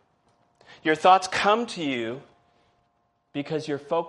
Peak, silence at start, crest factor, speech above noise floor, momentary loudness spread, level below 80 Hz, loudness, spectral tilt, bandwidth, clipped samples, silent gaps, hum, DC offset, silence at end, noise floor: -6 dBFS; 0.85 s; 20 dB; 47 dB; 16 LU; -70 dBFS; -24 LUFS; -4 dB/octave; 11.5 kHz; under 0.1%; none; none; under 0.1%; 0 s; -70 dBFS